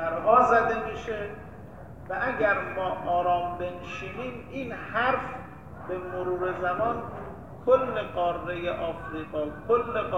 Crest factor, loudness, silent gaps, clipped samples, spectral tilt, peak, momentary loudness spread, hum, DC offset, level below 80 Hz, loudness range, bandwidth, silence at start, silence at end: 22 dB; -28 LUFS; none; under 0.1%; -6.5 dB/octave; -6 dBFS; 16 LU; none; 0.3%; -52 dBFS; 4 LU; 8.4 kHz; 0 s; 0 s